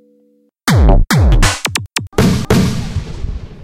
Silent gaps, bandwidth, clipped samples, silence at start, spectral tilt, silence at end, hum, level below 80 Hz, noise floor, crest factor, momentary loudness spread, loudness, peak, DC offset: none; 17 kHz; under 0.1%; 0.65 s; -5 dB/octave; 0 s; none; -16 dBFS; -54 dBFS; 12 dB; 13 LU; -14 LUFS; 0 dBFS; under 0.1%